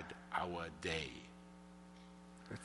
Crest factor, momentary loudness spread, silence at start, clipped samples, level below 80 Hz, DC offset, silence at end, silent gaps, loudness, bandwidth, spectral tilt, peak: 22 dB; 17 LU; 0 s; under 0.1%; -66 dBFS; under 0.1%; 0 s; none; -44 LUFS; 11.5 kHz; -4.5 dB/octave; -24 dBFS